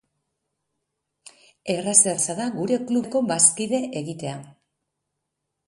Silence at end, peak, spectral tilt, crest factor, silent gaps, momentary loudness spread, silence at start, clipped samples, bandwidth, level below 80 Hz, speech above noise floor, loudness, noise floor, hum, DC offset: 1.15 s; -2 dBFS; -3 dB/octave; 24 dB; none; 16 LU; 1.65 s; under 0.1%; 11.5 kHz; -70 dBFS; 58 dB; -21 LUFS; -80 dBFS; none; under 0.1%